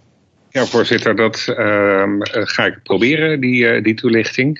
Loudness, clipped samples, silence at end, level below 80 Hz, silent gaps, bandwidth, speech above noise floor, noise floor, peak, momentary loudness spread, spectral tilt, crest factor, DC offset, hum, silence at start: -15 LUFS; under 0.1%; 0 s; -60 dBFS; none; 7.8 kHz; 40 dB; -55 dBFS; 0 dBFS; 4 LU; -5.5 dB/octave; 16 dB; under 0.1%; none; 0.55 s